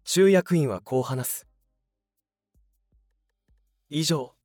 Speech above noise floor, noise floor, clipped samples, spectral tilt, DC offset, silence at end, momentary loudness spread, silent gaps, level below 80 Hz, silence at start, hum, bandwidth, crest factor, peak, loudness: 61 dB; -85 dBFS; under 0.1%; -5 dB/octave; under 0.1%; 0.15 s; 12 LU; none; -68 dBFS; 0.05 s; none; over 20 kHz; 18 dB; -8 dBFS; -24 LUFS